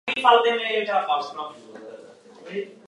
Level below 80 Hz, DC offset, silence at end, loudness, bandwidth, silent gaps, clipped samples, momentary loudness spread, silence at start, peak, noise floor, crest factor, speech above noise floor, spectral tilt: -78 dBFS; under 0.1%; 0.15 s; -22 LUFS; 11.5 kHz; none; under 0.1%; 24 LU; 0.05 s; -2 dBFS; -46 dBFS; 22 dB; 24 dB; -3 dB/octave